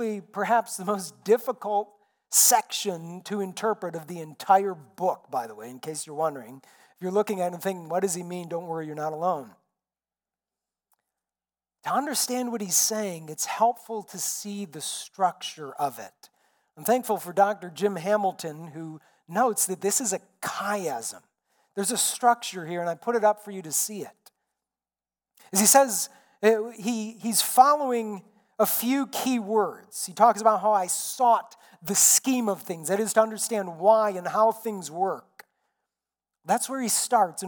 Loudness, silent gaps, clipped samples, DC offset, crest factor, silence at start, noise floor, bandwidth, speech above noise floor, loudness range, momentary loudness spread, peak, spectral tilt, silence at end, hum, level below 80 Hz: -25 LUFS; none; under 0.1%; under 0.1%; 22 dB; 0 s; under -90 dBFS; 19 kHz; over 64 dB; 8 LU; 16 LU; -4 dBFS; -2.5 dB/octave; 0 s; none; -88 dBFS